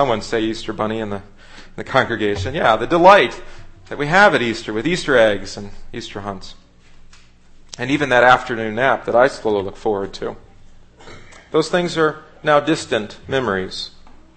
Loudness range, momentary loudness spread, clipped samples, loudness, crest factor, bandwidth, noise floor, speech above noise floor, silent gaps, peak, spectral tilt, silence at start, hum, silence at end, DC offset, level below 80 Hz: 6 LU; 19 LU; under 0.1%; -17 LUFS; 18 dB; 8.8 kHz; -44 dBFS; 27 dB; none; 0 dBFS; -5 dB/octave; 0 s; 60 Hz at -50 dBFS; 0.25 s; under 0.1%; -40 dBFS